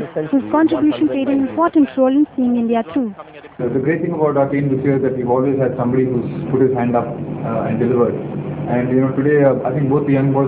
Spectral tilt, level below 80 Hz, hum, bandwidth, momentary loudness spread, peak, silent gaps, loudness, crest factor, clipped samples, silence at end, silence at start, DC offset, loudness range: -12.5 dB/octave; -50 dBFS; none; 4 kHz; 8 LU; 0 dBFS; none; -17 LUFS; 16 dB; under 0.1%; 0 s; 0 s; under 0.1%; 2 LU